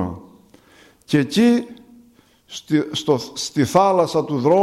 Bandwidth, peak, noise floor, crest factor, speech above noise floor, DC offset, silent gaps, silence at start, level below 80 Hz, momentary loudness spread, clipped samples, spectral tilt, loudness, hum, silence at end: 14 kHz; -4 dBFS; -53 dBFS; 16 dB; 35 dB; under 0.1%; none; 0 s; -56 dBFS; 19 LU; under 0.1%; -5.5 dB/octave; -19 LUFS; none; 0 s